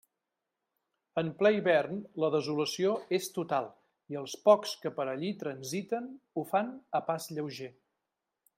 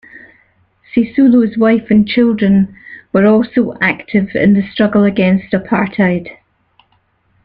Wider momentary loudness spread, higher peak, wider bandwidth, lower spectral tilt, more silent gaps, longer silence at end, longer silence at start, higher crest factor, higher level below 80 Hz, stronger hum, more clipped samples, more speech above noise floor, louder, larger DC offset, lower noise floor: first, 14 LU vs 6 LU; second, -10 dBFS vs -2 dBFS; first, 16 kHz vs 5 kHz; second, -5 dB/octave vs -10 dB/octave; neither; second, 0.9 s vs 1.1 s; first, 1.15 s vs 0.15 s; first, 24 dB vs 12 dB; second, -80 dBFS vs -48 dBFS; neither; neither; first, 56 dB vs 46 dB; second, -32 LUFS vs -13 LUFS; neither; first, -87 dBFS vs -58 dBFS